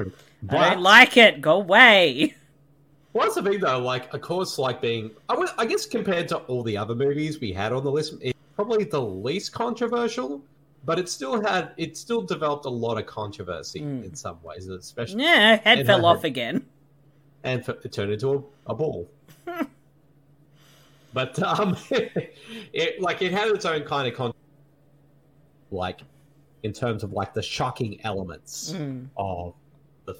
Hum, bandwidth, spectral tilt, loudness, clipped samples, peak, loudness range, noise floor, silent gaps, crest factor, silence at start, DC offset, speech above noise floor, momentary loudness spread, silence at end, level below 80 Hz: none; 17 kHz; -4 dB/octave; -22 LUFS; under 0.1%; 0 dBFS; 12 LU; -59 dBFS; none; 24 dB; 0 s; under 0.1%; 36 dB; 19 LU; 0.05 s; -60 dBFS